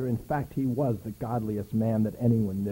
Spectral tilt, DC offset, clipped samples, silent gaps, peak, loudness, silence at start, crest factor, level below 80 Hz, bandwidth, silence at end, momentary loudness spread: -9.5 dB/octave; under 0.1%; under 0.1%; none; -14 dBFS; -29 LUFS; 0 s; 14 dB; -52 dBFS; 16.5 kHz; 0 s; 6 LU